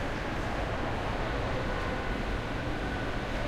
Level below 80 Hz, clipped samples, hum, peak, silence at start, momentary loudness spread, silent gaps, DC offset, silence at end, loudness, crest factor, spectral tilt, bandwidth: -38 dBFS; under 0.1%; none; -20 dBFS; 0 s; 1 LU; none; under 0.1%; 0 s; -33 LUFS; 12 dB; -6 dB/octave; 14 kHz